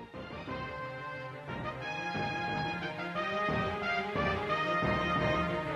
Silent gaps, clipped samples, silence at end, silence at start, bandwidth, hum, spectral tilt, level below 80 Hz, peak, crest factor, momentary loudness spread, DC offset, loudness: none; under 0.1%; 0 s; 0 s; 13 kHz; none; -6 dB/octave; -52 dBFS; -18 dBFS; 16 dB; 11 LU; under 0.1%; -34 LUFS